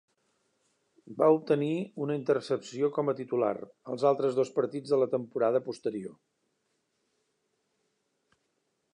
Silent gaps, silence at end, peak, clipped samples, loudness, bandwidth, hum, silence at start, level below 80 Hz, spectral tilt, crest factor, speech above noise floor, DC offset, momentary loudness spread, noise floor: none; 2.85 s; -12 dBFS; under 0.1%; -29 LUFS; 10.5 kHz; none; 1.05 s; -84 dBFS; -7 dB/octave; 20 dB; 49 dB; under 0.1%; 10 LU; -78 dBFS